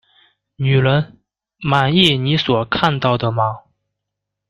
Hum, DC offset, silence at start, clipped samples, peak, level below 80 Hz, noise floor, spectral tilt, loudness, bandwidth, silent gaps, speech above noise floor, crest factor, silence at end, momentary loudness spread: 50 Hz at -40 dBFS; under 0.1%; 0.6 s; under 0.1%; 0 dBFS; -50 dBFS; -80 dBFS; -6.5 dB/octave; -16 LUFS; 10.5 kHz; none; 64 dB; 18 dB; 0.9 s; 10 LU